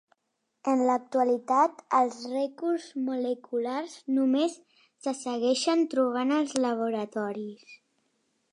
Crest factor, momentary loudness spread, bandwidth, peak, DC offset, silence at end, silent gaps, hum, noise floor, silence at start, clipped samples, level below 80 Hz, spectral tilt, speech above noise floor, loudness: 20 dB; 9 LU; 11 kHz; -8 dBFS; under 0.1%; 0.75 s; none; none; -80 dBFS; 0.65 s; under 0.1%; -86 dBFS; -4 dB/octave; 52 dB; -28 LUFS